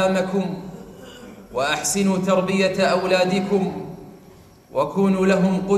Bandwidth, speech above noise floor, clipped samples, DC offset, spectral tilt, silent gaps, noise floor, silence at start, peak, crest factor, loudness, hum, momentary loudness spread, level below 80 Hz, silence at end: 15 kHz; 28 dB; under 0.1%; under 0.1%; -5 dB/octave; none; -47 dBFS; 0 s; -6 dBFS; 16 dB; -20 LUFS; none; 21 LU; -54 dBFS; 0 s